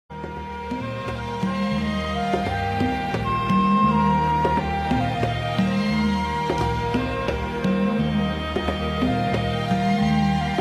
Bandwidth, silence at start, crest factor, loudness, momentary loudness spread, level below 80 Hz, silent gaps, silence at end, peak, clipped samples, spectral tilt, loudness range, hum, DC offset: 12.5 kHz; 0.1 s; 16 dB; -23 LUFS; 9 LU; -36 dBFS; none; 0 s; -6 dBFS; under 0.1%; -7 dB/octave; 3 LU; none; under 0.1%